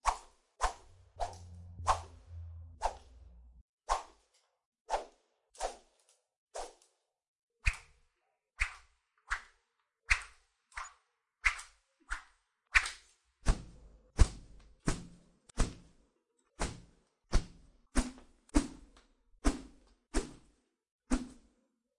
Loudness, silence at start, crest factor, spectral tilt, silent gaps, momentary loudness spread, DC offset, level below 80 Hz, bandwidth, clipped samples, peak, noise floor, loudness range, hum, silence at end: -37 LUFS; 0.05 s; 30 dB; -4 dB/octave; 3.61-3.78 s, 4.65-4.72 s, 4.81-4.85 s, 6.36-6.47 s, 7.28-7.48 s, 20.91-20.99 s; 22 LU; under 0.1%; -42 dBFS; 11.5 kHz; under 0.1%; -8 dBFS; -82 dBFS; 7 LU; none; 0.65 s